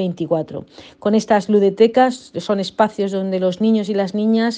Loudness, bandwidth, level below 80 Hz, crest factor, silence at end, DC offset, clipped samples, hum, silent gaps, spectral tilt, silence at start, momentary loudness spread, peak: -18 LUFS; 9.2 kHz; -62 dBFS; 16 dB; 0 s; under 0.1%; under 0.1%; none; none; -6.5 dB/octave; 0 s; 9 LU; -2 dBFS